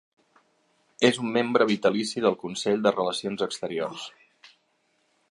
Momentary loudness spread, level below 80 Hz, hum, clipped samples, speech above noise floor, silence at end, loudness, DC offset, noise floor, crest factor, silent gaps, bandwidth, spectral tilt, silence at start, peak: 9 LU; -72 dBFS; none; under 0.1%; 45 dB; 1.2 s; -25 LUFS; under 0.1%; -70 dBFS; 22 dB; none; 11.5 kHz; -4.5 dB/octave; 1 s; -6 dBFS